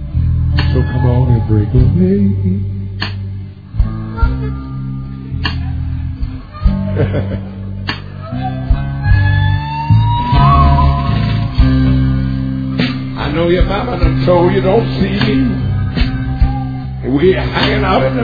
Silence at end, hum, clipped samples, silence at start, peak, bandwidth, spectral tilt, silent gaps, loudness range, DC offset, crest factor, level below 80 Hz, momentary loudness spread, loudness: 0 s; none; under 0.1%; 0 s; 0 dBFS; 5 kHz; -9.5 dB/octave; none; 7 LU; 0.4%; 14 dB; -20 dBFS; 11 LU; -14 LUFS